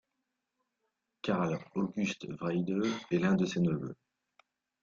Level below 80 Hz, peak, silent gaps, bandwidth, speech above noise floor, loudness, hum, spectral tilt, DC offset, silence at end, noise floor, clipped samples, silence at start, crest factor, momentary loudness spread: -68 dBFS; -16 dBFS; none; 7.4 kHz; 53 dB; -33 LUFS; none; -6.5 dB/octave; under 0.1%; 0.9 s; -85 dBFS; under 0.1%; 1.25 s; 18 dB; 9 LU